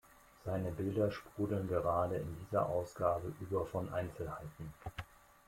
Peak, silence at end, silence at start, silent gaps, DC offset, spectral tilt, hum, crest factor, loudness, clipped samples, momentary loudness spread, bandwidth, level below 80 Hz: -18 dBFS; 0.3 s; 0.45 s; none; under 0.1%; -8 dB/octave; none; 20 dB; -38 LUFS; under 0.1%; 13 LU; 16.5 kHz; -60 dBFS